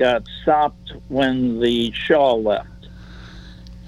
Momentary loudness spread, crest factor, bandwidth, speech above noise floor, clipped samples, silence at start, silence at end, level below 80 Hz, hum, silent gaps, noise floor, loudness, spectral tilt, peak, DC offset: 24 LU; 16 dB; 11 kHz; 20 dB; under 0.1%; 0 s; 0 s; -42 dBFS; none; none; -39 dBFS; -19 LUFS; -6 dB/octave; -4 dBFS; under 0.1%